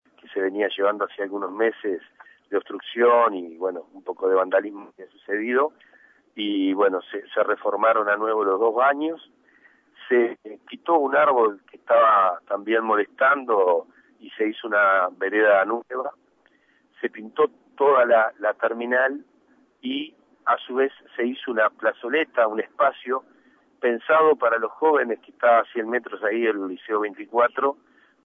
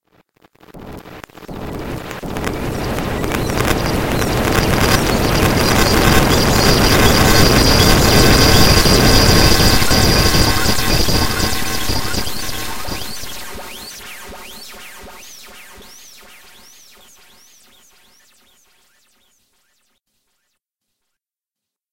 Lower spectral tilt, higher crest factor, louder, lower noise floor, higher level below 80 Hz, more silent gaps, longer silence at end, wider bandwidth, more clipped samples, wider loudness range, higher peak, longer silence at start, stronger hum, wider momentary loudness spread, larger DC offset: first, -6.5 dB/octave vs -4 dB/octave; about the same, 16 dB vs 16 dB; second, -22 LUFS vs -13 LUFS; second, -62 dBFS vs -87 dBFS; second, -84 dBFS vs -24 dBFS; neither; first, 0.5 s vs 0 s; second, 3.8 kHz vs 17.5 kHz; neither; second, 4 LU vs 19 LU; second, -8 dBFS vs 0 dBFS; first, 0.3 s vs 0 s; neither; second, 12 LU vs 23 LU; neither